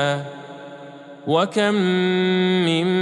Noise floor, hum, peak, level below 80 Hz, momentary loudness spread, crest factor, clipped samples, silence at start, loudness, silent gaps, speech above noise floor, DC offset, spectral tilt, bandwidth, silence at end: -39 dBFS; none; -6 dBFS; -76 dBFS; 19 LU; 16 dB; under 0.1%; 0 s; -19 LUFS; none; 20 dB; under 0.1%; -6 dB/octave; 10.5 kHz; 0 s